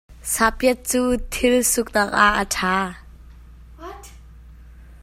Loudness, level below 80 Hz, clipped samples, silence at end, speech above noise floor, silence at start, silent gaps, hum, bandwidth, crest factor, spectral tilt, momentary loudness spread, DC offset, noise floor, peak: -19 LUFS; -40 dBFS; under 0.1%; 0.05 s; 23 dB; 0.1 s; none; none; 16 kHz; 22 dB; -2.5 dB/octave; 21 LU; under 0.1%; -43 dBFS; 0 dBFS